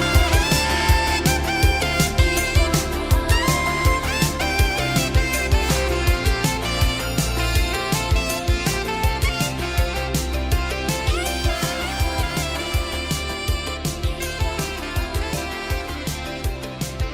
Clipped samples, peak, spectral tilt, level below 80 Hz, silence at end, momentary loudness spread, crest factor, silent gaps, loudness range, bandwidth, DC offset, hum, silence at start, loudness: under 0.1%; -4 dBFS; -4 dB/octave; -26 dBFS; 0 s; 8 LU; 18 dB; none; 6 LU; 16.5 kHz; under 0.1%; none; 0 s; -21 LUFS